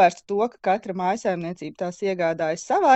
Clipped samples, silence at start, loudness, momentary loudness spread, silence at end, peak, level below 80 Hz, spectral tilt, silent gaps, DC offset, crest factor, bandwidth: under 0.1%; 0 s; -25 LUFS; 8 LU; 0 s; -4 dBFS; -68 dBFS; -5 dB/octave; none; under 0.1%; 18 dB; 8.4 kHz